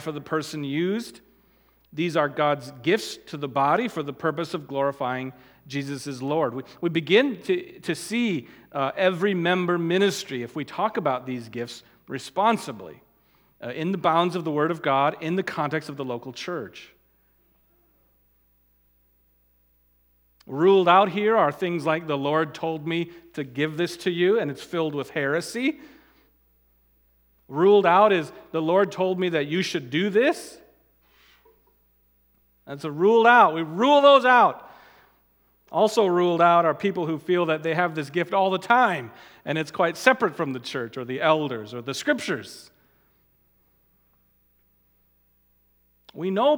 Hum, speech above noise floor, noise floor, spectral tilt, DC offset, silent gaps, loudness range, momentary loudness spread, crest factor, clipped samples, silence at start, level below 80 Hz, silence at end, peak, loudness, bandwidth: 60 Hz at -55 dBFS; 42 dB; -65 dBFS; -5.5 dB/octave; under 0.1%; none; 9 LU; 15 LU; 24 dB; under 0.1%; 0 s; -70 dBFS; 0 s; 0 dBFS; -23 LUFS; 18.5 kHz